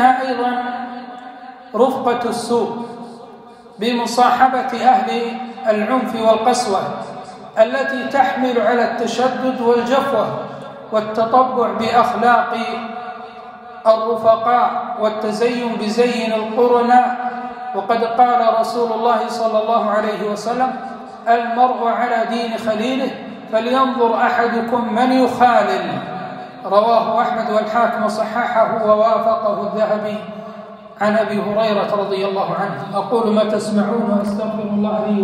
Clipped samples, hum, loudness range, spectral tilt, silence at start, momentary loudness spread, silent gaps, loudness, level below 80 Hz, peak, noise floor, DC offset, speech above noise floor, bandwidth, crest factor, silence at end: under 0.1%; none; 3 LU; -5 dB/octave; 0 s; 14 LU; none; -17 LUFS; -62 dBFS; 0 dBFS; -40 dBFS; under 0.1%; 23 dB; 14.5 kHz; 16 dB; 0 s